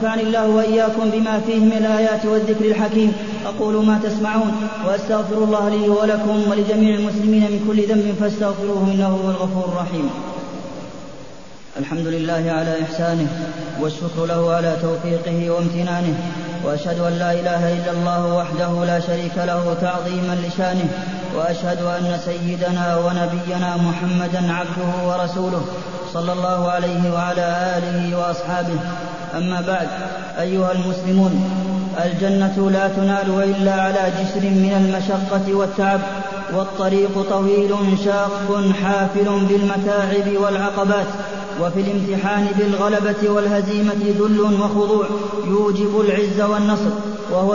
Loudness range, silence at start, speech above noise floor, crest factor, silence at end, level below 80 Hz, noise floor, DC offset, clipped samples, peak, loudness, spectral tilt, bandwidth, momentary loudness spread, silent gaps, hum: 4 LU; 0 s; 22 dB; 14 dB; 0 s; -52 dBFS; -40 dBFS; 1%; under 0.1%; -4 dBFS; -19 LUFS; -7 dB/octave; 7.4 kHz; 7 LU; none; none